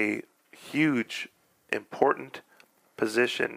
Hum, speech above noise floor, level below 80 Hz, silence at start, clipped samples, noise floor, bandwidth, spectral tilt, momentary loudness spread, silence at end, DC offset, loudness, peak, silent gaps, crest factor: none; 33 dB; -80 dBFS; 0 s; under 0.1%; -61 dBFS; 15.5 kHz; -4.5 dB/octave; 17 LU; 0 s; under 0.1%; -28 LUFS; -6 dBFS; none; 24 dB